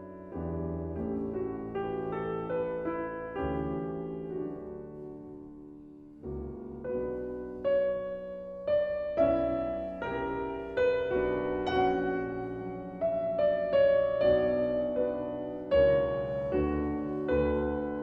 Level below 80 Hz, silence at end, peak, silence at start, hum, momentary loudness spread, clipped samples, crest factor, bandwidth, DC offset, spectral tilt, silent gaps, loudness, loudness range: -48 dBFS; 0 s; -14 dBFS; 0 s; none; 15 LU; under 0.1%; 16 dB; 5.8 kHz; under 0.1%; -9 dB/octave; none; -31 LUFS; 11 LU